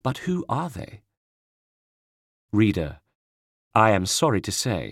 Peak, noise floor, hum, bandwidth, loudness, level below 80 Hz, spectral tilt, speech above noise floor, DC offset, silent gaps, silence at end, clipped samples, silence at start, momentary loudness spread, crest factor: -4 dBFS; under -90 dBFS; none; 16.5 kHz; -23 LUFS; -50 dBFS; -4.5 dB/octave; over 67 dB; under 0.1%; 1.17-2.48 s, 3.15-3.71 s; 0 s; under 0.1%; 0.05 s; 14 LU; 22 dB